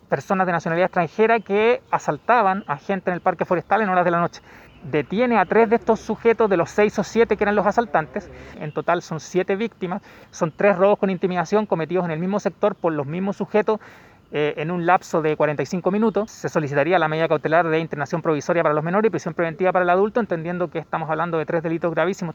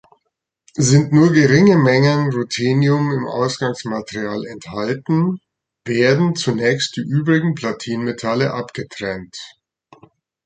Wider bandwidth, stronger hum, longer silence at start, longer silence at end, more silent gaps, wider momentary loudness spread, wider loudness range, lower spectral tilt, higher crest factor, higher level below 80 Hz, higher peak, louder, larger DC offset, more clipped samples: second, 8 kHz vs 9.4 kHz; neither; second, 0.1 s vs 0.75 s; second, 0 s vs 1 s; neither; second, 8 LU vs 16 LU; second, 3 LU vs 7 LU; about the same, -6.5 dB/octave vs -6 dB/octave; about the same, 18 dB vs 16 dB; about the same, -56 dBFS vs -54 dBFS; about the same, -2 dBFS vs -2 dBFS; second, -21 LUFS vs -17 LUFS; neither; neither